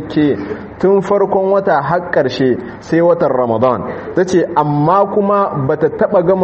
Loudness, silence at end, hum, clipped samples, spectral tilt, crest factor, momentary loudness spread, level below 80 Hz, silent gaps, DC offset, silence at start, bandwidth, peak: -14 LUFS; 0 s; none; under 0.1%; -7.5 dB/octave; 12 dB; 5 LU; -46 dBFS; none; under 0.1%; 0 s; 8.4 kHz; 0 dBFS